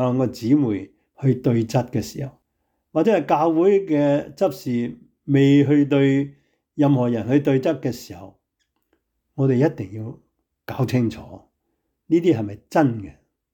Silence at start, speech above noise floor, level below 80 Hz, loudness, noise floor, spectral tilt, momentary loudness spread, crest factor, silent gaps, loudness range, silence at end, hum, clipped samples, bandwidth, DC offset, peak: 0 s; 54 dB; -60 dBFS; -20 LUFS; -74 dBFS; -8 dB/octave; 17 LU; 14 dB; none; 6 LU; 0.45 s; none; under 0.1%; 18.5 kHz; under 0.1%; -6 dBFS